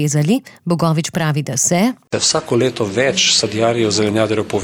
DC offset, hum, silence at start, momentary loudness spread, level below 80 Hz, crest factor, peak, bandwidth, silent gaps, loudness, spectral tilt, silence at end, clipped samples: under 0.1%; none; 0 s; 6 LU; -54 dBFS; 12 dB; -4 dBFS; 18 kHz; none; -16 LUFS; -4 dB/octave; 0 s; under 0.1%